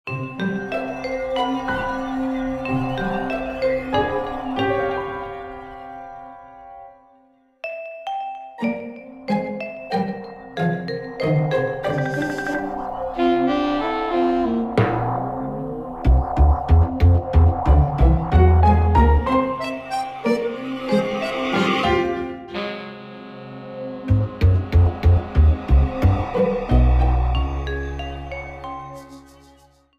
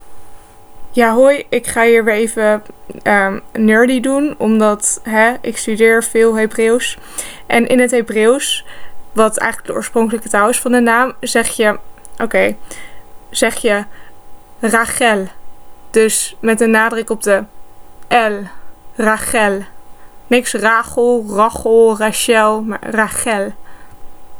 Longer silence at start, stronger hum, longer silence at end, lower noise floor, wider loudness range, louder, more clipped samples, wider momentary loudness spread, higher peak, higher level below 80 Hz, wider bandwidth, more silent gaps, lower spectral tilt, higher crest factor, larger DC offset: about the same, 0.05 s vs 0 s; neither; first, 0.8 s vs 0 s; first, -56 dBFS vs -34 dBFS; first, 11 LU vs 4 LU; second, -21 LUFS vs -14 LUFS; neither; first, 16 LU vs 10 LU; second, -4 dBFS vs 0 dBFS; first, -24 dBFS vs -44 dBFS; second, 7.8 kHz vs over 20 kHz; neither; first, -8 dB/octave vs -3 dB/octave; about the same, 18 dB vs 14 dB; neither